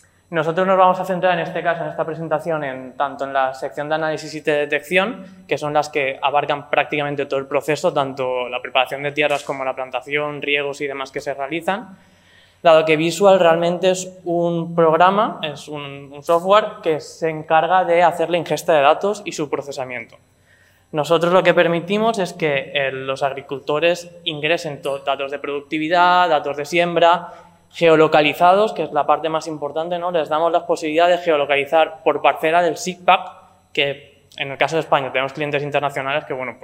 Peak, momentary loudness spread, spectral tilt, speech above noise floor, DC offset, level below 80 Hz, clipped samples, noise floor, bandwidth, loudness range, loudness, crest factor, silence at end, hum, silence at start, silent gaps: -2 dBFS; 11 LU; -4.5 dB/octave; 36 dB; under 0.1%; -68 dBFS; under 0.1%; -54 dBFS; 16 kHz; 5 LU; -19 LUFS; 18 dB; 0.1 s; none; 0.3 s; none